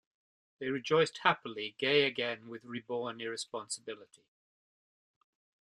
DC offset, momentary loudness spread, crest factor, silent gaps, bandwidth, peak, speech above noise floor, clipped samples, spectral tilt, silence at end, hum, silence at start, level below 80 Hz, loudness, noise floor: under 0.1%; 15 LU; 26 dB; none; 11.5 kHz; -10 dBFS; over 56 dB; under 0.1%; -3.5 dB/octave; 1.75 s; none; 0.6 s; -80 dBFS; -33 LUFS; under -90 dBFS